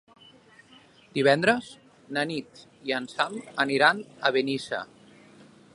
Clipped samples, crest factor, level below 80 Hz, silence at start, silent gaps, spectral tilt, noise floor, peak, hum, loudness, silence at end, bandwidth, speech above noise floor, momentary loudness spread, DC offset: under 0.1%; 24 dB; -72 dBFS; 1.15 s; none; -4.5 dB/octave; -55 dBFS; -4 dBFS; none; -26 LUFS; 0.9 s; 11.5 kHz; 29 dB; 14 LU; under 0.1%